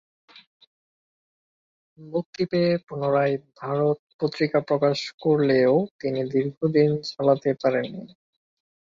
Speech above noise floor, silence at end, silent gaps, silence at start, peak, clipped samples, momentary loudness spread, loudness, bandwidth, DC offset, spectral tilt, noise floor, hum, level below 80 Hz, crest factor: over 67 dB; 0.85 s; 2.26-2.33 s, 3.99-4.07 s, 4.14-4.19 s, 5.14-5.18 s, 5.91-5.99 s, 6.57-6.61 s; 2 s; -6 dBFS; under 0.1%; 9 LU; -24 LUFS; 7.6 kHz; under 0.1%; -7.5 dB/octave; under -90 dBFS; none; -68 dBFS; 18 dB